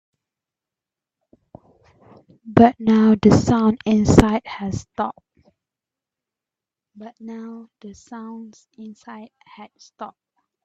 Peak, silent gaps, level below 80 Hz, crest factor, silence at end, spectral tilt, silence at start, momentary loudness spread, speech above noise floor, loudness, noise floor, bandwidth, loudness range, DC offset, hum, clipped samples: 0 dBFS; none; -42 dBFS; 22 dB; 0.55 s; -7 dB/octave; 2.45 s; 25 LU; 69 dB; -17 LUFS; -88 dBFS; 8.4 kHz; 22 LU; under 0.1%; none; under 0.1%